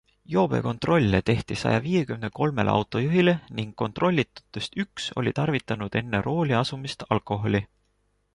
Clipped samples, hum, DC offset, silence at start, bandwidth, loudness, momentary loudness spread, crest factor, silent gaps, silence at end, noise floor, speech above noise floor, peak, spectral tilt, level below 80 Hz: under 0.1%; none; under 0.1%; 0.3 s; 11.5 kHz; -25 LUFS; 9 LU; 20 dB; none; 0.7 s; -70 dBFS; 45 dB; -6 dBFS; -6.5 dB/octave; -50 dBFS